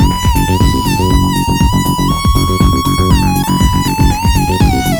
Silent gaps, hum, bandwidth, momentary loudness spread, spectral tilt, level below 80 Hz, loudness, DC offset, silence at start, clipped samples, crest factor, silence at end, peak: none; none; over 20 kHz; 2 LU; -5.5 dB/octave; -16 dBFS; -12 LUFS; under 0.1%; 0 s; under 0.1%; 10 dB; 0 s; 0 dBFS